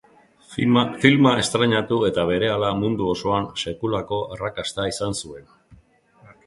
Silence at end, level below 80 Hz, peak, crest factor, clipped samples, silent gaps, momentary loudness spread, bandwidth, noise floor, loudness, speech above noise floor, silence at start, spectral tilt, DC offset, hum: 0.7 s; -50 dBFS; 0 dBFS; 22 dB; under 0.1%; none; 11 LU; 11.5 kHz; -55 dBFS; -21 LUFS; 34 dB; 0.5 s; -5 dB/octave; under 0.1%; none